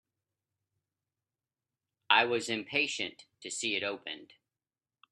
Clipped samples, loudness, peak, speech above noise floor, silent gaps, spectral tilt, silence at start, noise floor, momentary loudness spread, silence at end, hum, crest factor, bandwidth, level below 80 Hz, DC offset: under 0.1%; -31 LUFS; -8 dBFS; over 56 dB; none; -1.5 dB/octave; 2.1 s; under -90 dBFS; 17 LU; 0.85 s; none; 28 dB; 12.5 kHz; -82 dBFS; under 0.1%